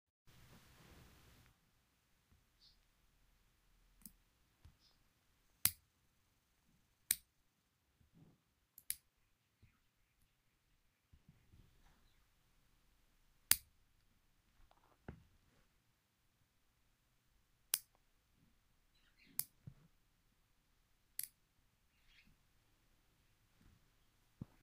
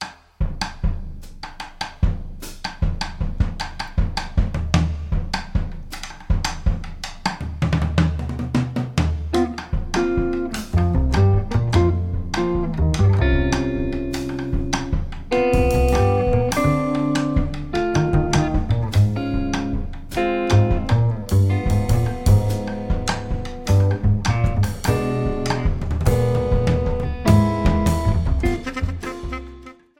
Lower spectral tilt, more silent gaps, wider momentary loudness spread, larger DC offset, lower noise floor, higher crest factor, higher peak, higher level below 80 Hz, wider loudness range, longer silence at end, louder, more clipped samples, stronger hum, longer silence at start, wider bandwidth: second, 0 dB/octave vs -6.5 dB/octave; neither; first, 26 LU vs 11 LU; neither; first, -81 dBFS vs -41 dBFS; first, 48 dB vs 18 dB; second, -6 dBFS vs -2 dBFS; second, -74 dBFS vs -26 dBFS; first, 24 LU vs 5 LU; first, 3.35 s vs 0.25 s; second, -41 LUFS vs -21 LUFS; neither; neither; first, 4.05 s vs 0 s; about the same, 15.5 kHz vs 17 kHz